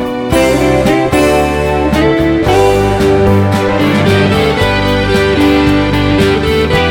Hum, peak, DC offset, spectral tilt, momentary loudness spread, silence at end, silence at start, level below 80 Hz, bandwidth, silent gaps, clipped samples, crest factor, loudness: none; 0 dBFS; under 0.1%; -6 dB/octave; 2 LU; 0 s; 0 s; -24 dBFS; 18 kHz; none; under 0.1%; 10 dB; -10 LUFS